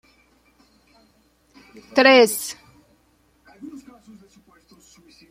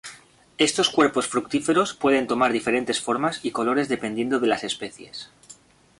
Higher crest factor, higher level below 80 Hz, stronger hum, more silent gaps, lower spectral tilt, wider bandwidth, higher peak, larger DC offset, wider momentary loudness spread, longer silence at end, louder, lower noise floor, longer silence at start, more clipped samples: about the same, 22 dB vs 20 dB; about the same, -66 dBFS vs -62 dBFS; neither; neither; second, -2 dB/octave vs -3.5 dB/octave; first, 16 kHz vs 11.5 kHz; about the same, -2 dBFS vs -4 dBFS; neither; first, 29 LU vs 15 LU; first, 1.55 s vs 0.45 s; first, -16 LUFS vs -23 LUFS; first, -61 dBFS vs -51 dBFS; first, 1.95 s vs 0.05 s; neither